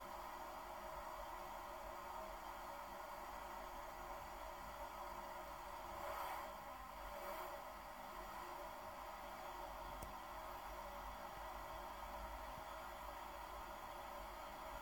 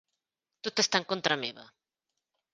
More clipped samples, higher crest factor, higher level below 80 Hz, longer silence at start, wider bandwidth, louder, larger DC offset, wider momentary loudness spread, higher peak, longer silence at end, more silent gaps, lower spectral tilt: neither; second, 20 dB vs 26 dB; first, -62 dBFS vs -76 dBFS; second, 0 s vs 0.65 s; first, 17.5 kHz vs 10 kHz; second, -51 LUFS vs -29 LUFS; neither; second, 2 LU vs 11 LU; second, -30 dBFS vs -8 dBFS; second, 0 s vs 0.9 s; neither; first, -3.5 dB/octave vs -2 dB/octave